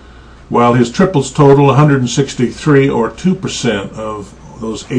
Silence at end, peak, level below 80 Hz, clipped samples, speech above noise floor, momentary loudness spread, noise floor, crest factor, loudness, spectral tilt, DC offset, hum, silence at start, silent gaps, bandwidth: 0 s; 0 dBFS; -38 dBFS; under 0.1%; 25 dB; 16 LU; -37 dBFS; 12 dB; -12 LUFS; -6.5 dB/octave; under 0.1%; none; 0.5 s; none; 9.8 kHz